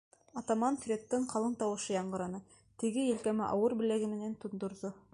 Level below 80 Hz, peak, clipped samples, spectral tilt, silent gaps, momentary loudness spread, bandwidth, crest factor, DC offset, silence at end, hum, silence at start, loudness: -70 dBFS; -18 dBFS; under 0.1%; -5.5 dB/octave; none; 10 LU; 11.5 kHz; 16 dB; under 0.1%; 0.15 s; none; 0.35 s; -35 LUFS